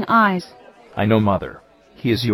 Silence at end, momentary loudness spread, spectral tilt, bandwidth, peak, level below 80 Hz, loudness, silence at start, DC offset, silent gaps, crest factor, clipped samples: 0 s; 18 LU; -7 dB/octave; 15.5 kHz; -2 dBFS; -50 dBFS; -19 LUFS; 0 s; under 0.1%; none; 16 dB; under 0.1%